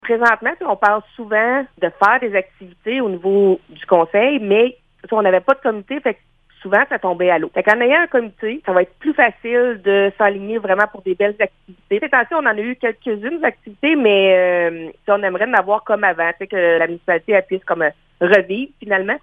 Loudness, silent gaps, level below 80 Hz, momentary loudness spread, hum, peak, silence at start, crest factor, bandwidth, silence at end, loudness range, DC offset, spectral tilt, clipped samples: -17 LUFS; none; -58 dBFS; 8 LU; none; 0 dBFS; 0.05 s; 16 dB; 7.4 kHz; 0.05 s; 2 LU; under 0.1%; -6.5 dB/octave; under 0.1%